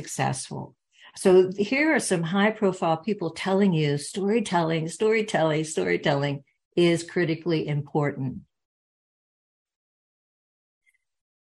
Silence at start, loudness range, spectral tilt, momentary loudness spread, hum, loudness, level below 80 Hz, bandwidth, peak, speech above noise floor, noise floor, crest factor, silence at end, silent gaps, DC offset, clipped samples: 0 s; 9 LU; -5.5 dB/octave; 9 LU; none; -24 LUFS; -66 dBFS; 12.5 kHz; -8 dBFS; over 66 dB; under -90 dBFS; 18 dB; 3.05 s; 6.65-6.71 s; under 0.1%; under 0.1%